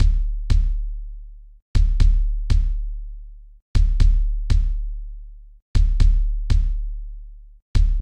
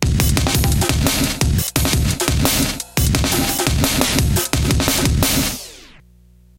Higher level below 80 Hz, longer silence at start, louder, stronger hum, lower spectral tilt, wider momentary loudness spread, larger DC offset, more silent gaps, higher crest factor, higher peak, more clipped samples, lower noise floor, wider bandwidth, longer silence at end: first, -18 dBFS vs -24 dBFS; about the same, 0 s vs 0 s; second, -24 LUFS vs -17 LUFS; neither; first, -6.5 dB/octave vs -4 dB/octave; first, 20 LU vs 3 LU; neither; first, 1.62-1.74 s, 3.62-3.74 s, 5.62-5.74 s, 7.62-7.74 s vs none; about the same, 16 dB vs 18 dB; second, -4 dBFS vs 0 dBFS; neither; second, -38 dBFS vs -48 dBFS; second, 6.8 kHz vs 17.5 kHz; second, 0 s vs 0.75 s